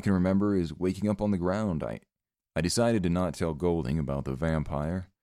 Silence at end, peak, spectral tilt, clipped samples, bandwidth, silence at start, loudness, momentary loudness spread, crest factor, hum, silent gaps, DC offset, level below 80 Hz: 0.15 s; -12 dBFS; -6.5 dB/octave; under 0.1%; 14 kHz; 0 s; -29 LUFS; 8 LU; 16 dB; none; none; under 0.1%; -46 dBFS